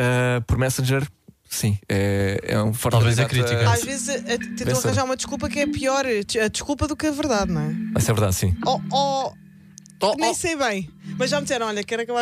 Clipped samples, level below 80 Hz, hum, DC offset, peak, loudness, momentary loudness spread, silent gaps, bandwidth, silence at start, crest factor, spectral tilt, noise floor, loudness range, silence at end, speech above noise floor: under 0.1%; -42 dBFS; none; under 0.1%; -6 dBFS; -22 LUFS; 6 LU; none; 15.5 kHz; 0 s; 16 dB; -5 dB/octave; -46 dBFS; 2 LU; 0 s; 24 dB